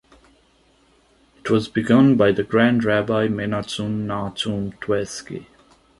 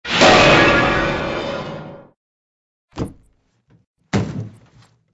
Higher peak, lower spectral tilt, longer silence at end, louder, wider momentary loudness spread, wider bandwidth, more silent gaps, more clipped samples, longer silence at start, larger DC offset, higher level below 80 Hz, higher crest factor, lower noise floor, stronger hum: about the same, -2 dBFS vs 0 dBFS; first, -6 dB/octave vs -4 dB/octave; about the same, 0.55 s vs 0.65 s; second, -20 LUFS vs -14 LUFS; second, 14 LU vs 21 LU; about the same, 11.5 kHz vs 11 kHz; second, none vs 2.16-2.88 s, 3.87-3.94 s; neither; first, 1.45 s vs 0.05 s; neither; second, -52 dBFS vs -38 dBFS; about the same, 18 dB vs 18 dB; about the same, -58 dBFS vs -59 dBFS; neither